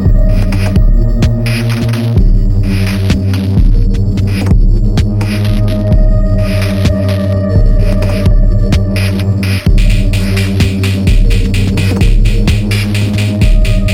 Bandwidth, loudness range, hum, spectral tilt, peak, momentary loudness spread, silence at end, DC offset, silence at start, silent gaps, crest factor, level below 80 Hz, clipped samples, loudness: 13.5 kHz; 0 LU; none; -7 dB/octave; 0 dBFS; 2 LU; 0 s; under 0.1%; 0 s; none; 8 dB; -12 dBFS; under 0.1%; -12 LUFS